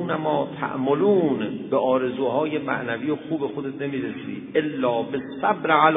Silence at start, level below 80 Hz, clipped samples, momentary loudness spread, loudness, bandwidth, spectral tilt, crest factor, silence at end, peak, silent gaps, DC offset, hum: 0 s; -64 dBFS; under 0.1%; 9 LU; -24 LUFS; 3.9 kHz; -10 dB/octave; 20 dB; 0 s; -4 dBFS; none; under 0.1%; none